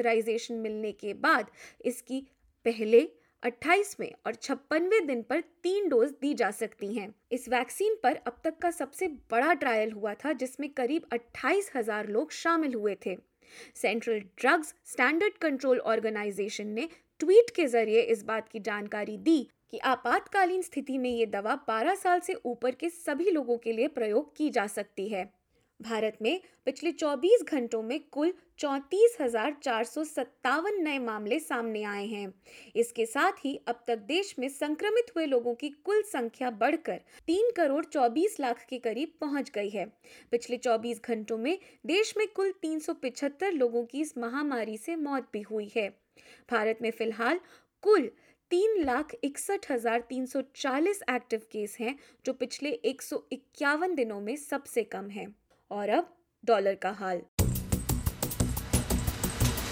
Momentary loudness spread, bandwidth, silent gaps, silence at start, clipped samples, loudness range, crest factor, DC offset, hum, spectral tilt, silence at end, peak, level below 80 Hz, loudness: 10 LU; 17.5 kHz; 57.28-57.37 s; 0 s; under 0.1%; 5 LU; 20 dB; under 0.1%; none; -4.5 dB/octave; 0 s; -10 dBFS; -50 dBFS; -30 LUFS